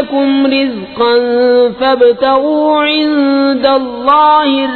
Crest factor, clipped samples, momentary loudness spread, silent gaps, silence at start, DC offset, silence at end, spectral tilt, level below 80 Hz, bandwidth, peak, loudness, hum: 10 dB; under 0.1%; 4 LU; none; 0 s; under 0.1%; 0 s; -7 dB/octave; -48 dBFS; 4.6 kHz; 0 dBFS; -10 LUFS; none